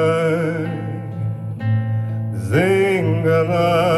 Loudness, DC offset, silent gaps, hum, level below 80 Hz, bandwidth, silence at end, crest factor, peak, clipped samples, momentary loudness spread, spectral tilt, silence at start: -19 LUFS; under 0.1%; none; none; -54 dBFS; 12.5 kHz; 0 s; 14 dB; -4 dBFS; under 0.1%; 10 LU; -7.5 dB/octave; 0 s